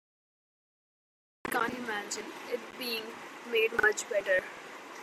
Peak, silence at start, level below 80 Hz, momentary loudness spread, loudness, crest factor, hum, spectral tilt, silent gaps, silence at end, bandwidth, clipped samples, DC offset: -12 dBFS; 1.45 s; -72 dBFS; 16 LU; -31 LUFS; 22 dB; none; -1.5 dB/octave; none; 0 s; 15.5 kHz; under 0.1%; under 0.1%